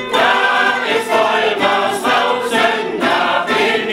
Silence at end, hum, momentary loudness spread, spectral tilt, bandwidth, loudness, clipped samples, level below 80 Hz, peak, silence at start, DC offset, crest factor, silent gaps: 0 s; none; 3 LU; -2.5 dB/octave; 16 kHz; -14 LUFS; under 0.1%; -58 dBFS; -2 dBFS; 0 s; under 0.1%; 12 dB; none